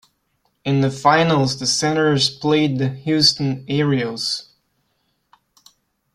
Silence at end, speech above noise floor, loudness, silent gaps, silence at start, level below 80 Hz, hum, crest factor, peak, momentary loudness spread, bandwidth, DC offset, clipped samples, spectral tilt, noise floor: 1.75 s; 50 dB; -18 LUFS; none; 0.65 s; -58 dBFS; none; 18 dB; -2 dBFS; 8 LU; 13 kHz; under 0.1%; under 0.1%; -4.5 dB/octave; -68 dBFS